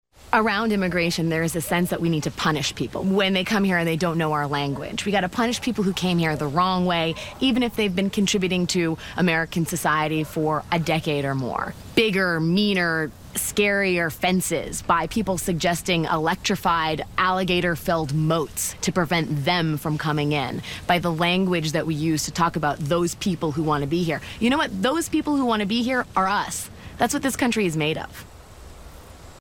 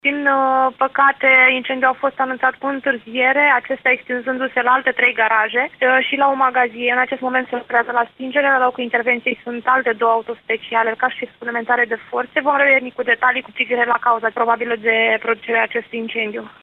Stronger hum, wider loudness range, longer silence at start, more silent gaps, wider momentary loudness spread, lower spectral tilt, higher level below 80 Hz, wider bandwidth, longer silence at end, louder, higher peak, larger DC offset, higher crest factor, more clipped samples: neither; about the same, 1 LU vs 3 LU; first, 0.25 s vs 0.05 s; neither; second, 5 LU vs 8 LU; second, -4.5 dB/octave vs -6 dB/octave; first, -46 dBFS vs -66 dBFS; first, 17 kHz vs 4.7 kHz; about the same, 0 s vs 0.1 s; second, -23 LUFS vs -17 LUFS; about the same, -4 dBFS vs -2 dBFS; neither; about the same, 20 dB vs 16 dB; neither